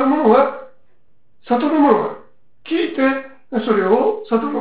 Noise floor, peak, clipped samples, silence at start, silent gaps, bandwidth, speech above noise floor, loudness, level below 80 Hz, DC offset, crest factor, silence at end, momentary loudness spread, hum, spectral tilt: -63 dBFS; -2 dBFS; under 0.1%; 0 s; none; 4 kHz; 47 dB; -17 LUFS; -62 dBFS; 0.7%; 16 dB; 0 s; 12 LU; none; -10 dB/octave